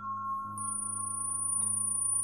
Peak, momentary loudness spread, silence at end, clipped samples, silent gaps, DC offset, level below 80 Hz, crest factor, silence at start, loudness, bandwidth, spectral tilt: -22 dBFS; 8 LU; 0 s; under 0.1%; none; under 0.1%; -72 dBFS; 10 dB; 0 s; -31 LUFS; 14.5 kHz; -3 dB/octave